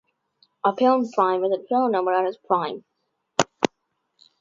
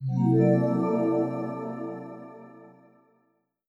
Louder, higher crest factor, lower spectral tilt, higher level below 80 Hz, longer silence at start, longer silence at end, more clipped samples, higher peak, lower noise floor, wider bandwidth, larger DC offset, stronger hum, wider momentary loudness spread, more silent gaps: first, -23 LUFS vs -26 LUFS; first, 24 dB vs 18 dB; second, -4.5 dB/octave vs -11 dB/octave; first, -68 dBFS vs -82 dBFS; first, 0.65 s vs 0 s; second, 0.75 s vs 1 s; neither; first, 0 dBFS vs -10 dBFS; about the same, -75 dBFS vs -72 dBFS; first, 7.8 kHz vs 7 kHz; neither; neither; second, 7 LU vs 22 LU; neither